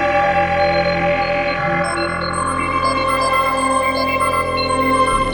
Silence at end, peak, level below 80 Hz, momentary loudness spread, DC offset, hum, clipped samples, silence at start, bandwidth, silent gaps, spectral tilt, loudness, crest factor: 0 s; -4 dBFS; -36 dBFS; 4 LU; under 0.1%; none; under 0.1%; 0 s; 19 kHz; none; -4.5 dB/octave; -17 LUFS; 14 dB